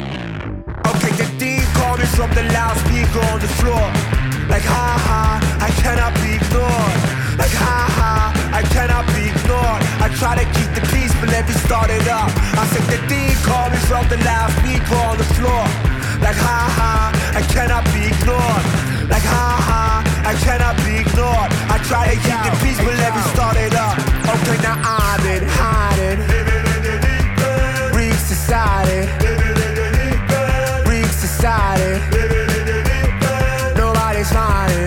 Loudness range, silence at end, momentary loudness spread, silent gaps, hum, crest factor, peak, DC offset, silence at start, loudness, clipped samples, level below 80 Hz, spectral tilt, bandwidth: 1 LU; 0 s; 2 LU; none; none; 10 dB; -4 dBFS; under 0.1%; 0 s; -16 LUFS; under 0.1%; -20 dBFS; -5 dB/octave; 17.5 kHz